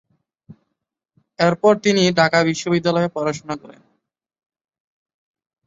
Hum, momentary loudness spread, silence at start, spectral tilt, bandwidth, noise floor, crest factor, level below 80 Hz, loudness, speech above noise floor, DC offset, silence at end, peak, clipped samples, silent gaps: none; 12 LU; 0.5 s; -5 dB/octave; 8 kHz; -78 dBFS; 20 dB; -60 dBFS; -18 LUFS; 61 dB; under 0.1%; 2.1 s; -2 dBFS; under 0.1%; none